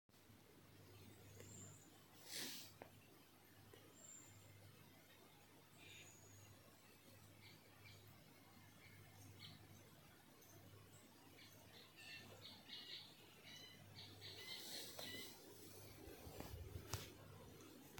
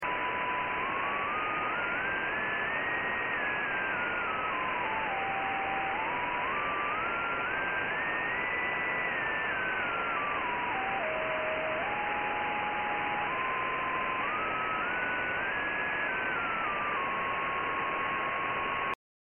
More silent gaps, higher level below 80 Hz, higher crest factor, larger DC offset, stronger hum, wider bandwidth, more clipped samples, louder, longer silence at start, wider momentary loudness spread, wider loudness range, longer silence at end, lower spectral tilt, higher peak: neither; second, -74 dBFS vs -58 dBFS; first, 34 dB vs 12 dB; neither; neither; first, 17 kHz vs 3.5 kHz; neither; second, -58 LUFS vs -31 LUFS; about the same, 0.1 s vs 0 s; first, 15 LU vs 1 LU; first, 10 LU vs 1 LU; second, 0 s vs 0.4 s; first, -3 dB/octave vs 2.5 dB/octave; second, -26 dBFS vs -20 dBFS